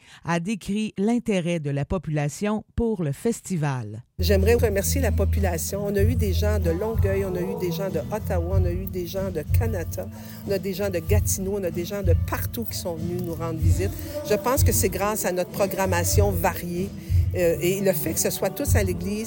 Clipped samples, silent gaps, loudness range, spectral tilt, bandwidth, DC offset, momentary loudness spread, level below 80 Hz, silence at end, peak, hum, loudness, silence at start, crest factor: under 0.1%; none; 3 LU; -5.5 dB/octave; 17 kHz; under 0.1%; 8 LU; -34 dBFS; 0 s; -6 dBFS; none; -24 LUFS; 0.1 s; 16 dB